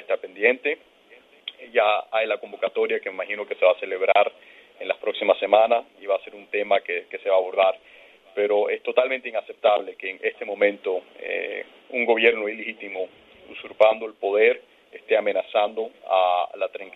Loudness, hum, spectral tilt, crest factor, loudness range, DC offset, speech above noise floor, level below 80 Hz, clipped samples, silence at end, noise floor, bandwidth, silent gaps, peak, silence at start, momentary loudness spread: -23 LUFS; none; -5 dB/octave; 22 dB; 2 LU; under 0.1%; 30 dB; -76 dBFS; under 0.1%; 0.05 s; -53 dBFS; 4.1 kHz; none; -2 dBFS; 0 s; 12 LU